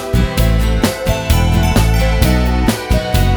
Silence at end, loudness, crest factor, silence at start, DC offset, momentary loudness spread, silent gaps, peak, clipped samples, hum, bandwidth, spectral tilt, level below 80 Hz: 0 s; -14 LUFS; 12 dB; 0 s; under 0.1%; 3 LU; none; 0 dBFS; under 0.1%; none; over 20 kHz; -5.5 dB/octave; -16 dBFS